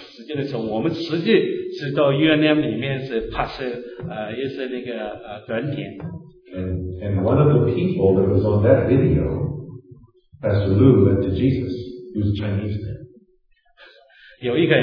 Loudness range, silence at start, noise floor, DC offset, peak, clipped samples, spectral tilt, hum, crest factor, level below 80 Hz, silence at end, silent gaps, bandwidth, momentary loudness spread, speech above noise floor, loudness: 9 LU; 0 s; -59 dBFS; under 0.1%; -2 dBFS; under 0.1%; -9.5 dB/octave; none; 18 dB; -42 dBFS; 0 s; none; 5.4 kHz; 15 LU; 40 dB; -20 LUFS